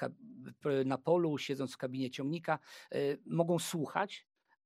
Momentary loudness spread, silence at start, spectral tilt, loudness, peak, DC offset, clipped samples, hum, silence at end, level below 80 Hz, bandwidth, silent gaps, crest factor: 10 LU; 0 s; -5.5 dB/octave; -36 LUFS; -16 dBFS; under 0.1%; under 0.1%; none; 0.45 s; -86 dBFS; 15.5 kHz; none; 20 dB